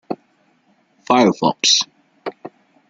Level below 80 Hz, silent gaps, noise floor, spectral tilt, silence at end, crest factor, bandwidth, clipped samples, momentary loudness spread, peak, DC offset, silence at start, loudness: -64 dBFS; none; -59 dBFS; -2.5 dB/octave; 0.4 s; 20 dB; 9.2 kHz; under 0.1%; 18 LU; 0 dBFS; under 0.1%; 0.1 s; -15 LUFS